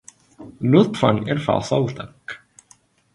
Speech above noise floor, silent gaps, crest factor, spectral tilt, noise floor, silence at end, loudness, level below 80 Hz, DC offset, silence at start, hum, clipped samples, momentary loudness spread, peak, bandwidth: 37 dB; none; 20 dB; -7 dB/octave; -56 dBFS; 0.8 s; -19 LUFS; -54 dBFS; under 0.1%; 0.4 s; none; under 0.1%; 20 LU; -2 dBFS; 11.5 kHz